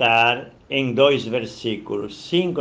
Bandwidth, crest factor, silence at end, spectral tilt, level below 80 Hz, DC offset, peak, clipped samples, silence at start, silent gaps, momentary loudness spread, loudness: 9.2 kHz; 18 dB; 0 s; -5.5 dB/octave; -58 dBFS; under 0.1%; -2 dBFS; under 0.1%; 0 s; none; 11 LU; -21 LUFS